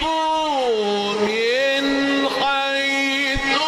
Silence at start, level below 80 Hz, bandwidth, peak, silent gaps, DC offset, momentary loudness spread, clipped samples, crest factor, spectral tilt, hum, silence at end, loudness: 0 s; -42 dBFS; 15 kHz; -8 dBFS; none; under 0.1%; 2 LU; under 0.1%; 12 dB; -3 dB/octave; none; 0 s; -19 LUFS